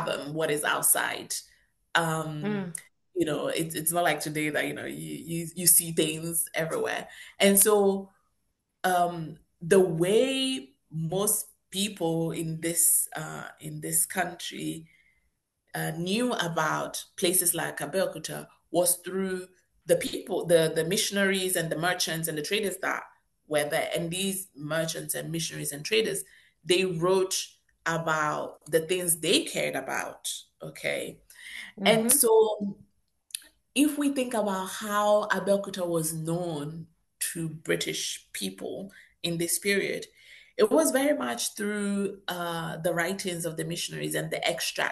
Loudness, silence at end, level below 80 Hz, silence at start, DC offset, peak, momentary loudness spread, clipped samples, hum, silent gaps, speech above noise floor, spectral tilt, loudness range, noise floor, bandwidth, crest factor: -27 LUFS; 0 s; -68 dBFS; 0 s; under 0.1%; -6 dBFS; 14 LU; under 0.1%; none; none; 49 dB; -3 dB/octave; 5 LU; -77 dBFS; 13 kHz; 22 dB